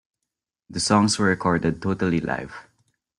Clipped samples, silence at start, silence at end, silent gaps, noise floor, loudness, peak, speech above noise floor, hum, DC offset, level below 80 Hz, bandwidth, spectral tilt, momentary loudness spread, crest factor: under 0.1%; 0.7 s; 0.6 s; none; -84 dBFS; -22 LUFS; -4 dBFS; 62 dB; none; under 0.1%; -52 dBFS; 11.5 kHz; -4.5 dB/octave; 15 LU; 20 dB